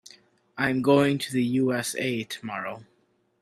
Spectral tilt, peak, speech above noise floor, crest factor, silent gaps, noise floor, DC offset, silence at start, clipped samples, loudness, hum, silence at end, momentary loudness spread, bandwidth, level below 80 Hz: -5 dB/octave; -8 dBFS; 31 dB; 20 dB; none; -56 dBFS; under 0.1%; 0.55 s; under 0.1%; -25 LUFS; none; 0.6 s; 14 LU; 14.5 kHz; -66 dBFS